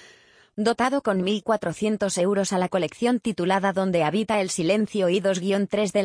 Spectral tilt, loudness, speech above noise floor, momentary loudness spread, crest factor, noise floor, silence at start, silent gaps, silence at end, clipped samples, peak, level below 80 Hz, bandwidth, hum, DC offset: -5 dB/octave; -23 LUFS; 32 dB; 3 LU; 14 dB; -54 dBFS; 0.55 s; none; 0 s; under 0.1%; -8 dBFS; -62 dBFS; 10.5 kHz; none; under 0.1%